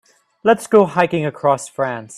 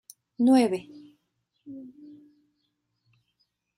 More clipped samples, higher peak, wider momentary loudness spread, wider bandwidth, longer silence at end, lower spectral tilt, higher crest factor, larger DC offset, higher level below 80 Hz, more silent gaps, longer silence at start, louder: neither; first, 0 dBFS vs -10 dBFS; second, 8 LU vs 26 LU; about the same, 13.5 kHz vs 14 kHz; second, 0 s vs 1.9 s; about the same, -5.5 dB/octave vs -5.5 dB/octave; about the same, 18 dB vs 20 dB; neither; first, -60 dBFS vs -76 dBFS; neither; about the same, 0.45 s vs 0.4 s; first, -17 LUFS vs -23 LUFS